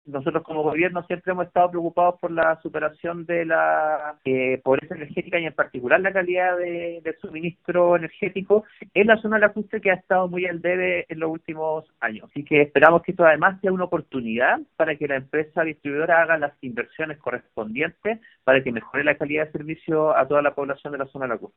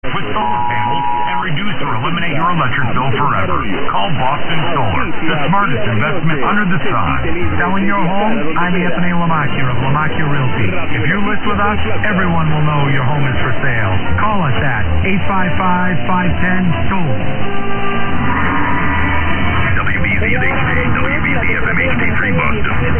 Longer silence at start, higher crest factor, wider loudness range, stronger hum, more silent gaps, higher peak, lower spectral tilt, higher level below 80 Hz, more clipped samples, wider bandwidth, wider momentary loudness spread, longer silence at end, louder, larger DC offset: about the same, 0.05 s vs 0.05 s; first, 22 dB vs 10 dB; about the same, 4 LU vs 2 LU; neither; neither; about the same, 0 dBFS vs -2 dBFS; second, -9 dB/octave vs -10.5 dB/octave; second, -62 dBFS vs -30 dBFS; neither; first, 4 kHz vs 3.4 kHz; first, 11 LU vs 3 LU; about the same, 0.1 s vs 0 s; second, -22 LUFS vs -15 LUFS; neither